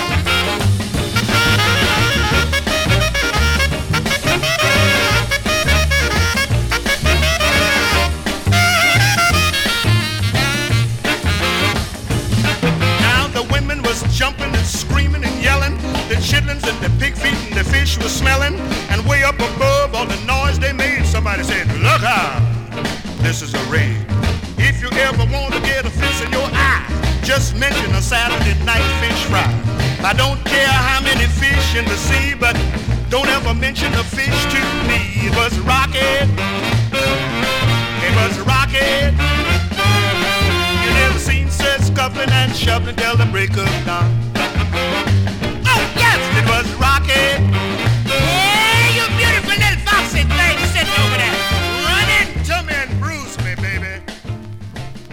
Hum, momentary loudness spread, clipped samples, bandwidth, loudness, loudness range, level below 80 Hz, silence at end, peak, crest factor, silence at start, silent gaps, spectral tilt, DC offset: none; 6 LU; under 0.1%; 19 kHz; -15 LUFS; 3 LU; -24 dBFS; 0 s; -2 dBFS; 14 dB; 0 s; none; -4 dB/octave; under 0.1%